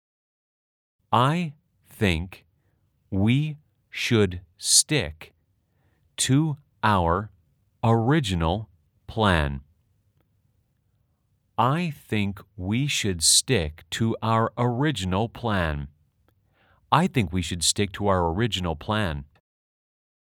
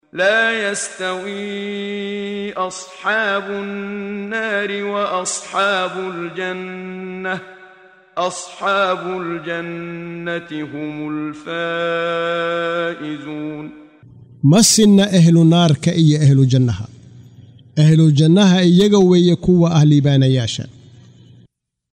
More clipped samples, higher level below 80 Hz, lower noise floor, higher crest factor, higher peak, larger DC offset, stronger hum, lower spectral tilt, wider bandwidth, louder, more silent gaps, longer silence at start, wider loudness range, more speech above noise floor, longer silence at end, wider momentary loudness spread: neither; first, -46 dBFS vs -52 dBFS; first, -69 dBFS vs -56 dBFS; first, 24 dB vs 14 dB; about the same, -2 dBFS vs -2 dBFS; neither; neither; second, -4 dB/octave vs -5.5 dB/octave; first, 18 kHz vs 16 kHz; second, -24 LUFS vs -16 LUFS; neither; first, 1.1 s vs 0.15 s; second, 5 LU vs 10 LU; first, 46 dB vs 40 dB; second, 1 s vs 1.2 s; about the same, 15 LU vs 16 LU